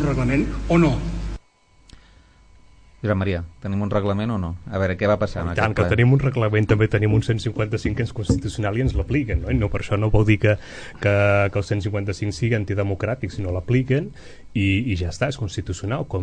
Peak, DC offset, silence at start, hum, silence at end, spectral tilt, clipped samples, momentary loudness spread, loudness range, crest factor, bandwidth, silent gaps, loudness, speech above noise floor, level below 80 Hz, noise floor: -2 dBFS; under 0.1%; 0 s; none; 0 s; -7.5 dB/octave; under 0.1%; 9 LU; 5 LU; 18 dB; 9.6 kHz; none; -22 LUFS; 34 dB; -34 dBFS; -55 dBFS